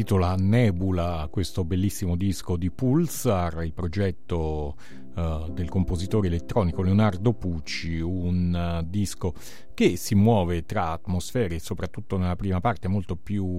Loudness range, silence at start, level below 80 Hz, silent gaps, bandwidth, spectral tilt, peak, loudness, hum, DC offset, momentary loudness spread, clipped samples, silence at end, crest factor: 3 LU; 0 s; -40 dBFS; none; 16 kHz; -7 dB/octave; -8 dBFS; -26 LUFS; none; 2%; 9 LU; under 0.1%; 0 s; 18 dB